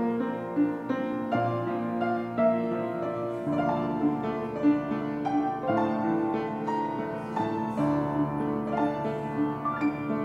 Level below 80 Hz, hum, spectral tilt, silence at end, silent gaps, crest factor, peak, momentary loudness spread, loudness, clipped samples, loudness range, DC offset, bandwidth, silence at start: -60 dBFS; none; -8.5 dB/octave; 0 s; none; 14 dB; -14 dBFS; 5 LU; -29 LUFS; under 0.1%; 1 LU; under 0.1%; 7.2 kHz; 0 s